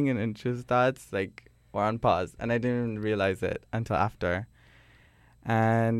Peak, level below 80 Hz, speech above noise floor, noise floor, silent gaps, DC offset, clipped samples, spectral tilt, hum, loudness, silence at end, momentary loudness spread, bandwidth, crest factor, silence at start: -10 dBFS; -54 dBFS; 31 dB; -59 dBFS; none; under 0.1%; under 0.1%; -7.5 dB/octave; none; -29 LUFS; 0 s; 8 LU; 13 kHz; 18 dB; 0 s